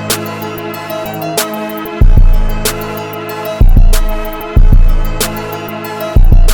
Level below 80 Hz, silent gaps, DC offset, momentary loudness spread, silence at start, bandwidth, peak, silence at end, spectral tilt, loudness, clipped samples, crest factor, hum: -10 dBFS; none; under 0.1%; 10 LU; 0 s; 19 kHz; 0 dBFS; 0 s; -5 dB/octave; -15 LUFS; 1%; 8 dB; none